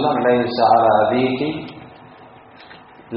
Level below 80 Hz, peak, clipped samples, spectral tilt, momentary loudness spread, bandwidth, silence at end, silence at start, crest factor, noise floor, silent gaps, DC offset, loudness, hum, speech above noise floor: -56 dBFS; -2 dBFS; under 0.1%; -4 dB/octave; 14 LU; 5.4 kHz; 0 s; 0 s; 18 dB; -43 dBFS; none; under 0.1%; -16 LUFS; none; 27 dB